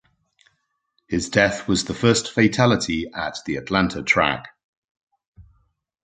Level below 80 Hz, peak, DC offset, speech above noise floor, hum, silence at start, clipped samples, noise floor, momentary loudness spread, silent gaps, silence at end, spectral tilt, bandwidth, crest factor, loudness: -48 dBFS; -2 dBFS; under 0.1%; 51 dB; none; 1.1 s; under 0.1%; -72 dBFS; 10 LU; 4.64-5.07 s, 5.27-5.32 s; 0.65 s; -4.5 dB/octave; 9.6 kHz; 22 dB; -21 LUFS